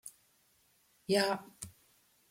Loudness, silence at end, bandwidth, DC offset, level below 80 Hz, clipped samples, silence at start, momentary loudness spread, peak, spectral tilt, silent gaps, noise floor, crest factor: -33 LUFS; 0.6 s; 16.5 kHz; under 0.1%; -76 dBFS; under 0.1%; 0.05 s; 20 LU; -16 dBFS; -3.5 dB/octave; none; -71 dBFS; 22 dB